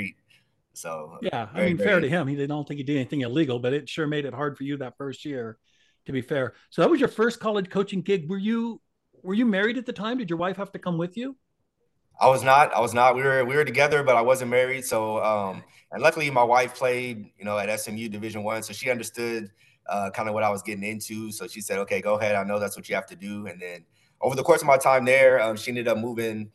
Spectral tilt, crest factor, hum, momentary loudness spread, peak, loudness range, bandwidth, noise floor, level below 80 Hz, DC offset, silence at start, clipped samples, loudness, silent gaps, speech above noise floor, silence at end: -5 dB/octave; 22 dB; none; 16 LU; -4 dBFS; 8 LU; 12.5 kHz; -74 dBFS; -68 dBFS; under 0.1%; 0 s; under 0.1%; -24 LUFS; none; 50 dB; 0.05 s